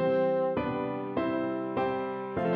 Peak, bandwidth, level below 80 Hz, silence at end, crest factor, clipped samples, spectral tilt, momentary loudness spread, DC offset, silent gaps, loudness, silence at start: -18 dBFS; 5.2 kHz; -60 dBFS; 0 s; 12 dB; under 0.1%; -9.5 dB/octave; 6 LU; under 0.1%; none; -30 LUFS; 0 s